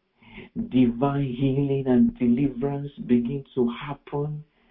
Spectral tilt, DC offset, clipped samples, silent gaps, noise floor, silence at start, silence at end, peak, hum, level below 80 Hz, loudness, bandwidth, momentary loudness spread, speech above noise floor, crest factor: -12.5 dB/octave; under 0.1%; under 0.1%; none; -47 dBFS; 0.3 s; 0.3 s; -8 dBFS; none; -50 dBFS; -24 LUFS; 3.8 kHz; 12 LU; 23 dB; 16 dB